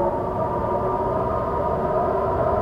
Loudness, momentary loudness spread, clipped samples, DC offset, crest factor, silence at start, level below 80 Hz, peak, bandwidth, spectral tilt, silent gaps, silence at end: -23 LUFS; 2 LU; under 0.1%; under 0.1%; 12 dB; 0 s; -38 dBFS; -10 dBFS; 13.5 kHz; -9.5 dB/octave; none; 0 s